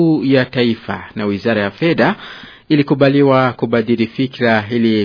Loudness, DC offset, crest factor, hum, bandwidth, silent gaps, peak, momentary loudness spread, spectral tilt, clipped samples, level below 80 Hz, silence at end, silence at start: -15 LUFS; under 0.1%; 14 dB; none; 5.4 kHz; none; 0 dBFS; 10 LU; -8.5 dB/octave; under 0.1%; -54 dBFS; 0 s; 0 s